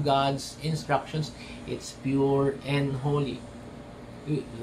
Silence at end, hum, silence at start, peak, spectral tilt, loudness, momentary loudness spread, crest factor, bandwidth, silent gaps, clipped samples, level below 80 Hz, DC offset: 0 s; none; 0 s; -10 dBFS; -6 dB/octave; -29 LUFS; 18 LU; 18 dB; 13.5 kHz; none; under 0.1%; -52 dBFS; under 0.1%